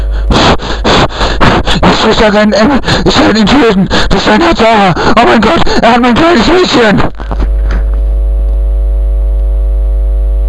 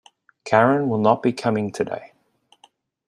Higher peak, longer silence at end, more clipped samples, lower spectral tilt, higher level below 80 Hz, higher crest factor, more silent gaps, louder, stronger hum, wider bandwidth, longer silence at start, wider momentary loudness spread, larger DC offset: about the same, 0 dBFS vs -2 dBFS; second, 0 s vs 1 s; first, 0.8% vs under 0.1%; second, -5.5 dB/octave vs -7 dB/octave; first, -12 dBFS vs -64 dBFS; second, 6 dB vs 20 dB; neither; first, -8 LUFS vs -20 LUFS; neither; about the same, 11 kHz vs 12 kHz; second, 0 s vs 0.45 s; second, 7 LU vs 12 LU; neither